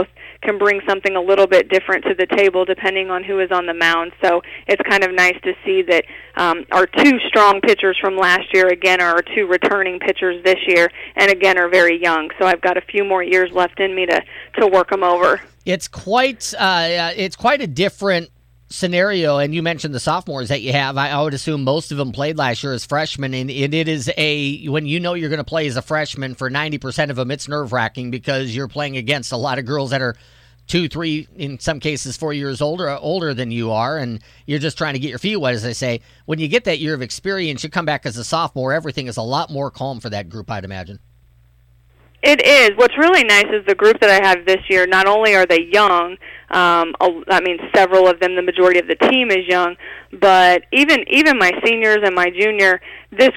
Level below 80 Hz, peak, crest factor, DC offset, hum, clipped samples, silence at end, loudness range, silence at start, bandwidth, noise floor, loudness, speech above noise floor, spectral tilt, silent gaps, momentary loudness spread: -50 dBFS; -2 dBFS; 14 dB; under 0.1%; none; under 0.1%; 0 s; 9 LU; 0 s; 16 kHz; -52 dBFS; -16 LUFS; 35 dB; -4.5 dB/octave; none; 12 LU